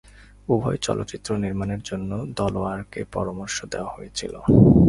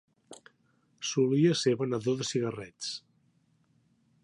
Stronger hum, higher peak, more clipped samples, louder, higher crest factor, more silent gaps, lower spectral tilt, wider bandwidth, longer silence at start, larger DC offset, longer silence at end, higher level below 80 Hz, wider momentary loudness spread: neither; first, -2 dBFS vs -14 dBFS; neither; first, -25 LUFS vs -29 LUFS; about the same, 20 dB vs 18 dB; neither; first, -6.5 dB/octave vs -5 dB/octave; about the same, 11.5 kHz vs 11.5 kHz; first, 0.5 s vs 0.3 s; neither; second, 0 s vs 1.25 s; first, -38 dBFS vs -74 dBFS; about the same, 12 LU vs 13 LU